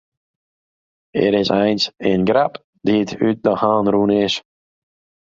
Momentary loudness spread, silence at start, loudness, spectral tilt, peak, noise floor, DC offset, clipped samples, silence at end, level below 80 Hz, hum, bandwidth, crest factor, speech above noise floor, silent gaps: 6 LU; 1.15 s; -18 LUFS; -6 dB/octave; -2 dBFS; under -90 dBFS; under 0.1%; under 0.1%; 0.85 s; -54 dBFS; none; 7.6 kHz; 16 dB; over 73 dB; 2.64-2.73 s